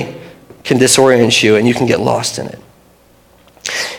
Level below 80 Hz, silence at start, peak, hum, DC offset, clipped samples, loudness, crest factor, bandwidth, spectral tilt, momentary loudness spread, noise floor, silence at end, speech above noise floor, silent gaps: -52 dBFS; 0 s; 0 dBFS; 60 Hz at -40 dBFS; under 0.1%; 0.2%; -11 LUFS; 14 dB; 17.5 kHz; -3.5 dB/octave; 18 LU; -48 dBFS; 0 s; 37 dB; none